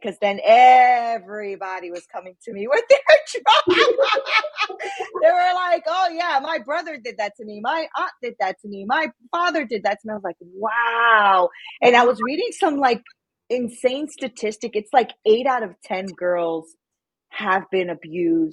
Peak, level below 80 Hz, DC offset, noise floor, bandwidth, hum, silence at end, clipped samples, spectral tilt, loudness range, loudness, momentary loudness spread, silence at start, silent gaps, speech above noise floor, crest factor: 0 dBFS; -72 dBFS; under 0.1%; -84 dBFS; 11.5 kHz; none; 0 s; under 0.1%; -3.5 dB/octave; 7 LU; -19 LUFS; 15 LU; 0 s; none; 65 dB; 20 dB